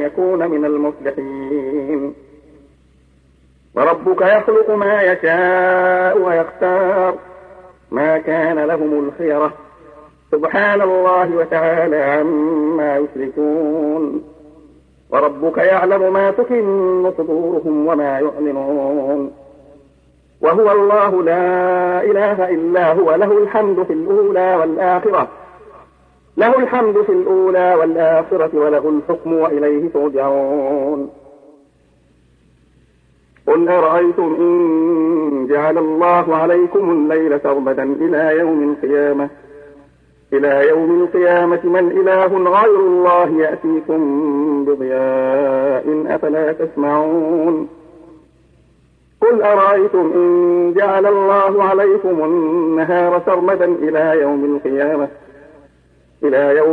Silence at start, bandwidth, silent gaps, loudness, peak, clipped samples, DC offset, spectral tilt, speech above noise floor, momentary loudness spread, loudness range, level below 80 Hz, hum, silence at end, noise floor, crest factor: 0 s; 4.4 kHz; none; -15 LUFS; -2 dBFS; under 0.1%; under 0.1%; -8.5 dB/octave; 39 dB; 6 LU; 5 LU; -58 dBFS; none; 0 s; -53 dBFS; 14 dB